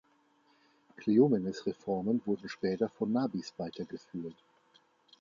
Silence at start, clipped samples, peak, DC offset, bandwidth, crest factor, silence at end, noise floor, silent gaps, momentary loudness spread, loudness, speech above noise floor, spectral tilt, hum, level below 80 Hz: 1 s; under 0.1%; -12 dBFS; under 0.1%; 7.4 kHz; 20 dB; 0.9 s; -69 dBFS; none; 16 LU; -33 LUFS; 37 dB; -7.5 dB/octave; none; -72 dBFS